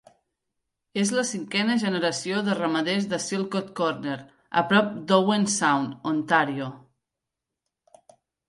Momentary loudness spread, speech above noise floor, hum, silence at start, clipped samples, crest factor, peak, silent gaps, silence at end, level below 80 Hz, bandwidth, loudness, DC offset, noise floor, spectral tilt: 8 LU; 62 dB; none; 0.95 s; under 0.1%; 20 dB; -6 dBFS; none; 1.7 s; -72 dBFS; 11.5 kHz; -25 LUFS; under 0.1%; -86 dBFS; -4 dB/octave